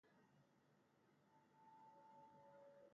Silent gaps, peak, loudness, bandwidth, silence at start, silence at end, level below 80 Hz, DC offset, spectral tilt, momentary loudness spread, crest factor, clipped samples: none; -58 dBFS; -68 LUFS; 6.6 kHz; 0.05 s; 0 s; under -90 dBFS; under 0.1%; -5 dB/octave; 1 LU; 12 dB; under 0.1%